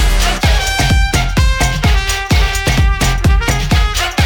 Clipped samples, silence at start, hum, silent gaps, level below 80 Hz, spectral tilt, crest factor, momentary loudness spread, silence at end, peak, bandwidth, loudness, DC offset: under 0.1%; 0 s; none; none; -14 dBFS; -4 dB/octave; 12 dB; 1 LU; 0 s; 0 dBFS; 19.5 kHz; -13 LUFS; under 0.1%